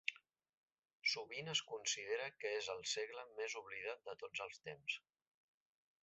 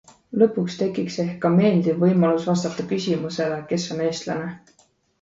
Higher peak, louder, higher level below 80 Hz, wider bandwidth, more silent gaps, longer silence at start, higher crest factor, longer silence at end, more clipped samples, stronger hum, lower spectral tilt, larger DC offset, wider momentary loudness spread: second, -22 dBFS vs -4 dBFS; second, -44 LUFS vs -22 LUFS; second, -88 dBFS vs -62 dBFS; about the same, 8 kHz vs 7.8 kHz; first, 0.49-0.68 s vs none; second, 0.05 s vs 0.3 s; first, 24 dB vs 18 dB; first, 1.05 s vs 0.65 s; neither; neither; second, 0.5 dB/octave vs -6.5 dB/octave; neither; about the same, 8 LU vs 9 LU